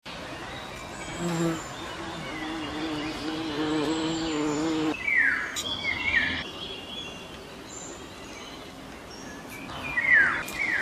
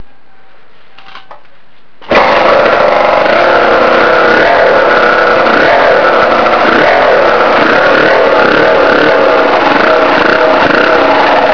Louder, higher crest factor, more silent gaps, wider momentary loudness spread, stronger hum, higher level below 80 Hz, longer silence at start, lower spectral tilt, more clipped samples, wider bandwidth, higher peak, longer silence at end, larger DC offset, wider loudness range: second, -27 LUFS vs -6 LUFS; first, 20 dB vs 8 dB; neither; first, 18 LU vs 1 LU; neither; second, -52 dBFS vs -38 dBFS; about the same, 0.05 s vs 0 s; second, -3.5 dB/octave vs -5 dB/octave; second, under 0.1% vs 2%; first, 14.5 kHz vs 5.4 kHz; second, -10 dBFS vs 0 dBFS; about the same, 0 s vs 0 s; second, under 0.1% vs 4%; first, 9 LU vs 3 LU